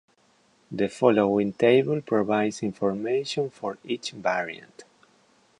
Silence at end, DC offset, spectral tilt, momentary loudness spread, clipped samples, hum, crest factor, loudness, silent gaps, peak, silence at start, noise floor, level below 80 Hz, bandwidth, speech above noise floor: 0.8 s; under 0.1%; -6 dB/octave; 12 LU; under 0.1%; none; 20 dB; -25 LUFS; none; -6 dBFS; 0.7 s; -63 dBFS; -66 dBFS; 11 kHz; 39 dB